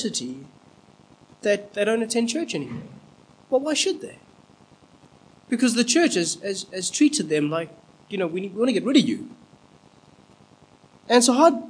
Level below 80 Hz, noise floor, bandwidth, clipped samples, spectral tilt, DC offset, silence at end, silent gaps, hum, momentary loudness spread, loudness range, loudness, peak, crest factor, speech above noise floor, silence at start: -70 dBFS; -54 dBFS; 10.5 kHz; under 0.1%; -3.5 dB/octave; under 0.1%; 0 s; none; none; 15 LU; 5 LU; -22 LUFS; -4 dBFS; 22 dB; 32 dB; 0 s